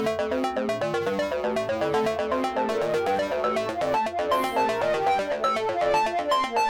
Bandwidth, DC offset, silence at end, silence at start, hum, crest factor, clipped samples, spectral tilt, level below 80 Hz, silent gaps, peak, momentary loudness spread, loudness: 18 kHz; under 0.1%; 0 s; 0 s; none; 12 dB; under 0.1%; -4.5 dB/octave; -56 dBFS; none; -14 dBFS; 3 LU; -25 LUFS